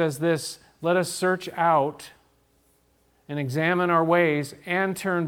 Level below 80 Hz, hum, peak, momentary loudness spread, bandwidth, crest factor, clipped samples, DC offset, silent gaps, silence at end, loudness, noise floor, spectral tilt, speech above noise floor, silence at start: -68 dBFS; none; -8 dBFS; 10 LU; 18 kHz; 18 dB; under 0.1%; under 0.1%; none; 0 s; -24 LUFS; -64 dBFS; -5.5 dB/octave; 40 dB; 0 s